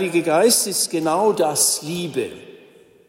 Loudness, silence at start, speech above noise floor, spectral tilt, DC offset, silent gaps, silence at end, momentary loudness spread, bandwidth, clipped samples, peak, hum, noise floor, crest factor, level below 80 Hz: -18 LUFS; 0 s; 30 dB; -2.5 dB/octave; under 0.1%; none; 0.5 s; 11 LU; 16.5 kHz; under 0.1%; -4 dBFS; none; -49 dBFS; 16 dB; -66 dBFS